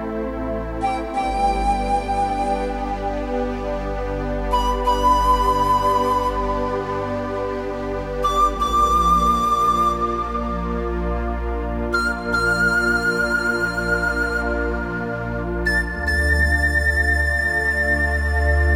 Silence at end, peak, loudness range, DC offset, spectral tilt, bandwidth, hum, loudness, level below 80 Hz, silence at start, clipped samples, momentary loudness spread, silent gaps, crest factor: 0 s; -6 dBFS; 4 LU; under 0.1%; -5.5 dB/octave; 16.5 kHz; none; -20 LUFS; -28 dBFS; 0 s; under 0.1%; 9 LU; none; 14 dB